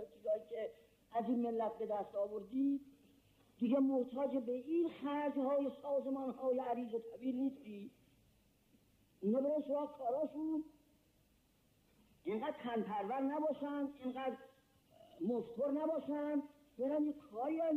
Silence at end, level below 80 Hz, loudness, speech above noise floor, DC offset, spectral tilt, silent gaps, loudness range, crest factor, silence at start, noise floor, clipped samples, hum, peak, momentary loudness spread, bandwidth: 0 s; -80 dBFS; -40 LUFS; 35 dB; under 0.1%; -8 dB/octave; none; 5 LU; 14 dB; 0 s; -74 dBFS; under 0.1%; none; -26 dBFS; 7 LU; 4.5 kHz